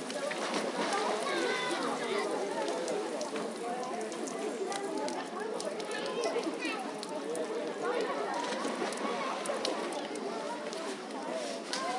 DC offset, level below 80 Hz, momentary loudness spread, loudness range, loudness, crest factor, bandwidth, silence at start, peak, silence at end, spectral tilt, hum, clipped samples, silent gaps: under 0.1%; -90 dBFS; 6 LU; 3 LU; -35 LUFS; 20 dB; 11.5 kHz; 0 s; -16 dBFS; 0 s; -3 dB/octave; none; under 0.1%; none